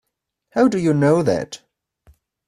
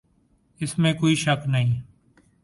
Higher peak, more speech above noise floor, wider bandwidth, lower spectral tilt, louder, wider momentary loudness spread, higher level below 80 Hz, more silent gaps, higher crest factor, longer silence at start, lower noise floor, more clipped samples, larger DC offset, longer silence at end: first, -4 dBFS vs -8 dBFS; first, 52 dB vs 42 dB; about the same, 12.5 kHz vs 11.5 kHz; first, -7 dB/octave vs -5.5 dB/octave; first, -18 LUFS vs -23 LUFS; first, 15 LU vs 10 LU; about the same, -56 dBFS vs -54 dBFS; neither; about the same, 16 dB vs 16 dB; about the same, 0.55 s vs 0.6 s; first, -69 dBFS vs -63 dBFS; neither; neither; first, 0.9 s vs 0.6 s